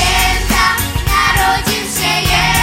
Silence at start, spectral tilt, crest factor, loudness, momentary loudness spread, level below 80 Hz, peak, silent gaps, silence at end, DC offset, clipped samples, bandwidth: 0 s; -2.5 dB/octave; 12 dB; -13 LUFS; 4 LU; -22 dBFS; 0 dBFS; none; 0 s; under 0.1%; under 0.1%; 16.5 kHz